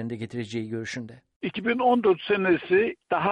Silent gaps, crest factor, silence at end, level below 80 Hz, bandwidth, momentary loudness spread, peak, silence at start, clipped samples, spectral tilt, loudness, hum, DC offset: 1.36-1.40 s; 16 dB; 0 s; -64 dBFS; 9.2 kHz; 13 LU; -10 dBFS; 0 s; under 0.1%; -6 dB/octave; -25 LUFS; none; under 0.1%